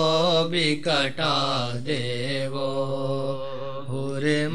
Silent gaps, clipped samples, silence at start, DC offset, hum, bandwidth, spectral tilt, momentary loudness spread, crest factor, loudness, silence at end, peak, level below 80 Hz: none; under 0.1%; 0 s; 2%; none; 12 kHz; -5 dB/octave; 10 LU; 16 dB; -25 LUFS; 0 s; -8 dBFS; -62 dBFS